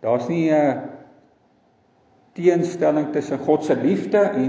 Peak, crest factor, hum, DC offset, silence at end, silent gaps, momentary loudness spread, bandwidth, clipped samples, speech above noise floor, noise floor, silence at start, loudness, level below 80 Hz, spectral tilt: -4 dBFS; 16 dB; none; under 0.1%; 0 s; none; 6 LU; 8 kHz; under 0.1%; 40 dB; -59 dBFS; 0 s; -20 LUFS; -68 dBFS; -7.5 dB/octave